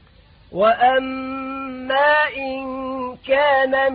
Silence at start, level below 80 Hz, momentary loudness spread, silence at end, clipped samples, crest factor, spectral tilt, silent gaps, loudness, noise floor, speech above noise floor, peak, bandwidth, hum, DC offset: 0.5 s; -52 dBFS; 13 LU; 0 s; under 0.1%; 14 dB; -8.5 dB/octave; none; -19 LUFS; -50 dBFS; 32 dB; -4 dBFS; 4.9 kHz; none; under 0.1%